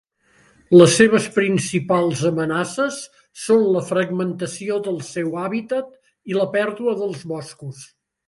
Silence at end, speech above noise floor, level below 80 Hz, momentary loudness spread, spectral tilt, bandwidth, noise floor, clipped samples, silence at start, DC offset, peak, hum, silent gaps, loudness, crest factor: 0.45 s; 38 dB; -62 dBFS; 17 LU; -5 dB/octave; 11.5 kHz; -57 dBFS; under 0.1%; 0.7 s; under 0.1%; 0 dBFS; none; none; -19 LUFS; 20 dB